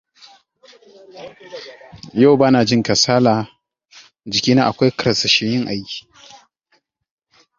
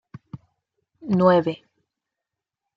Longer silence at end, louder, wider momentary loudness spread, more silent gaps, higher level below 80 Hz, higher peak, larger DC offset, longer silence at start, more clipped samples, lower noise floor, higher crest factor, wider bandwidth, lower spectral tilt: first, 1.6 s vs 1.2 s; first, -15 LUFS vs -20 LUFS; about the same, 24 LU vs 25 LU; neither; first, -54 dBFS vs -66 dBFS; first, 0 dBFS vs -6 dBFS; neither; first, 1.15 s vs 0.35 s; neither; second, -64 dBFS vs -86 dBFS; about the same, 18 dB vs 20 dB; first, 7.6 kHz vs 5.8 kHz; second, -4.5 dB/octave vs -9 dB/octave